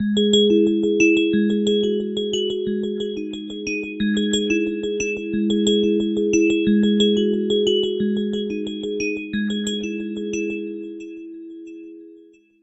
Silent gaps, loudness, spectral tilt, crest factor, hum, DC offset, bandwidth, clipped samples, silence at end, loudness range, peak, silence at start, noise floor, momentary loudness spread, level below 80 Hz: none; -20 LUFS; -4.5 dB/octave; 16 dB; none; under 0.1%; 8.4 kHz; under 0.1%; 0.45 s; 8 LU; -4 dBFS; 0 s; -49 dBFS; 15 LU; -54 dBFS